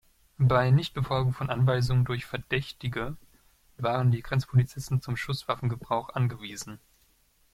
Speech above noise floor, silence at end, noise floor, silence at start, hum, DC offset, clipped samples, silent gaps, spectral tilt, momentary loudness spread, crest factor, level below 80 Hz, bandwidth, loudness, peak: 39 dB; 0.75 s; -65 dBFS; 0.4 s; none; under 0.1%; under 0.1%; none; -6.5 dB/octave; 11 LU; 18 dB; -50 dBFS; 13 kHz; -28 LUFS; -10 dBFS